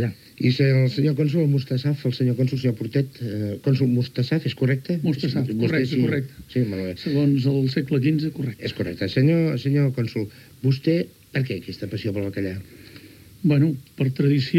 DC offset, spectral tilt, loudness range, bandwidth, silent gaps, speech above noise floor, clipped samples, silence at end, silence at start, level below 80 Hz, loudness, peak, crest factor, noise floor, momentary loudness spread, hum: under 0.1%; -8 dB/octave; 4 LU; 14.5 kHz; none; 24 dB; under 0.1%; 0 s; 0 s; -58 dBFS; -23 LUFS; -6 dBFS; 16 dB; -45 dBFS; 9 LU; none